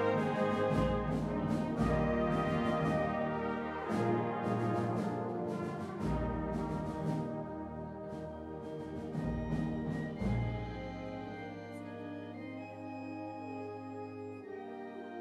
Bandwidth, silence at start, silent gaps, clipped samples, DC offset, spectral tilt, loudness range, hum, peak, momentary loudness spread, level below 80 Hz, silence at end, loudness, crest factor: 12 kHz; 0 s; none; under 0.1%; under 0.1%; -8 dB/octave; 11 LU; none; -20 dBFS; 12 LU; -50 dBFS; 0 s; -37 LUFS; 16 dB